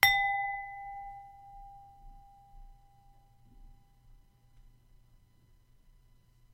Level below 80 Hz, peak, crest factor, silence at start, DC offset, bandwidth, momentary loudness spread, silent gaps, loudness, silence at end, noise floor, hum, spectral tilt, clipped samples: -58 dBFS; -4 dBFS; 34 dB; 0 s; under 0.1%; 16 kHz; 30 LU; none; -32 LUFS; 2.8 s; -64 dBFS; none; 0 dB/octave; under 0.1%